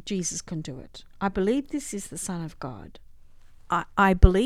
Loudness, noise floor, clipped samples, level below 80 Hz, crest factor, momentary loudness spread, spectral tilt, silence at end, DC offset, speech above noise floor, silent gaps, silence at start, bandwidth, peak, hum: -27 LUFS; -47 dBFS; under 0.1%; -30 dBFS; 26 dB; 18 LU; -5.5 dB/octave; 0 s; under 0.1%; 23 dB; none; 0.05 s; 14.5 kHz; 0 dBFS; none